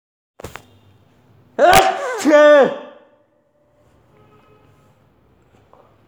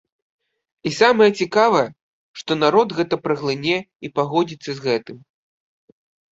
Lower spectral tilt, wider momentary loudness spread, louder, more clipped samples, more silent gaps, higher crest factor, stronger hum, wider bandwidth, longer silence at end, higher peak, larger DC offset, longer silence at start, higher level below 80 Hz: second, -3.5 dB/octave vs -5 dB/octave; first, 27 LU vs 11 LU; first, -12 LUFS vs -19 LUFS; neither; second, none vs 2.02-2.34 s, 3.95-4.00 s; about the same, 18 dB vs 20 dB; neither; first, over 20 kHz vs 8 kHz; first, 3.2 s vs 1.15 s; about the same, 0 dBFS vs -2 dBFS; neither; second, 0.45 s vs 0.85 s; first, -48 dBFS vs -64 dBFS